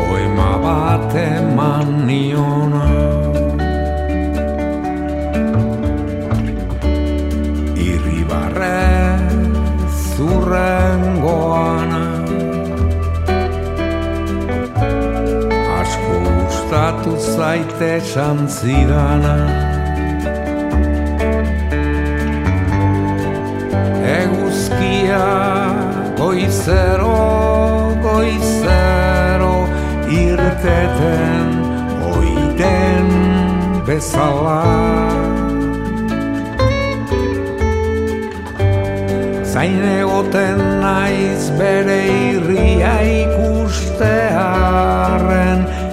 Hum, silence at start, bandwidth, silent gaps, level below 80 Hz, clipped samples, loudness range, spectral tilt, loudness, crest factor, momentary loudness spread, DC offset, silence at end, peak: none; 0 s; 14.5 kHz; none; -22 dBFS; under 0.1%; 4 LU; -7 dB/octave; -16 LUFS; 14 dB; 5 LU; under 0.1%; 0 s; 0 dBFS